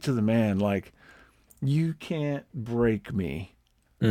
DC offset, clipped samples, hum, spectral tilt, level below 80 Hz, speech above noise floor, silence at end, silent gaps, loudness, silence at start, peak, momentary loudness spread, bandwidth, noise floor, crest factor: under 0.1%; under 0.1%; none; -8 dB/octave; -54 dBFS; 30 dB; 0 s; none; -28 LUFS; 0 s; -8 dBFS; 10 LU; 15 kHz; -57 dBFS; 20 dB